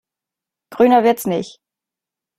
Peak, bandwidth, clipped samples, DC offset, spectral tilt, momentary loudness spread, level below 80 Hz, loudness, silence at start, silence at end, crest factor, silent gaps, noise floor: -2 dBFS; 16 kHz; under 0.1%; under 0.1%; -5.5 dB/octave; 13 LU; -62 dBFS; -16 LUFS; 0.7 s; 0.9 s; 18 dB; none; -87 dBFS